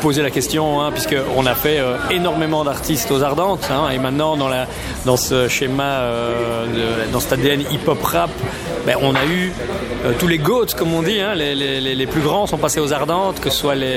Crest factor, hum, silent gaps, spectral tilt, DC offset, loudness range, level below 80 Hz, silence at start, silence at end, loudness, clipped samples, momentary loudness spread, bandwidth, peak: 18 dB; none; none; -4.5 dB/octave; under 0.1%; 1 LU; -38 dBFS; 0 s; 0 s; -18 LUFS; under 0.1%; 4 LU; 17.5 kHz; 0 dBFS